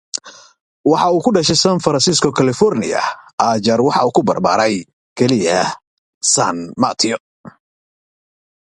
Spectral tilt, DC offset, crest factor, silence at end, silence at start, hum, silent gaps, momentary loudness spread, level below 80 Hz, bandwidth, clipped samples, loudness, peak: -4 dB/octave; under 0.1%; 16 dB; 1.25 s; 0.15 s; none; 0.61-0.84 s, 3.33-3.38 s, 4.93-5.16 s, 5.87-6.21 s, 7.20-7.44 s; 9 LU; -52 dBFS; 11.5 kHz; under 0.1%; -15 LUFS; 0 dBFS